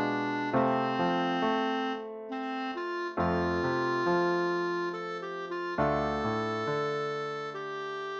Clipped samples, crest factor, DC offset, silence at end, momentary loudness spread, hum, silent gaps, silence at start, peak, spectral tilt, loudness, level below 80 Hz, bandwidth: under 0.1%; 16 dB; under 0.1%; 0 s; 9 LU; none; none; 0 s; -14 dBFS; -6.5 dB/octave; -31 LUFS; -56 dBFS; 8 kHz